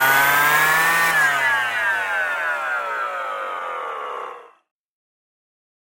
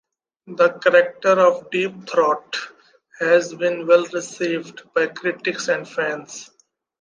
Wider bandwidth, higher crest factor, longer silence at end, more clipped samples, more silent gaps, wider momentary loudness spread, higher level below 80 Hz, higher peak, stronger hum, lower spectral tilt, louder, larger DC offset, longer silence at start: first, 17 kHz vs 9.4 kHz; about the same, 18 dB vs 20 dB; first, 1.5 s vs 0.55 s; neither; neither; about the same, 14 LU vs 13 LU; first, -64 dBFS vs -76 dBFS; about the same, -4 dBFS vs -2 dBFS; neither; second, -1 dB/octave vs -4 dB/octave; about the same, -19 LUFS vs -20 LUFS; neither; second, 0 s vs 0.45 s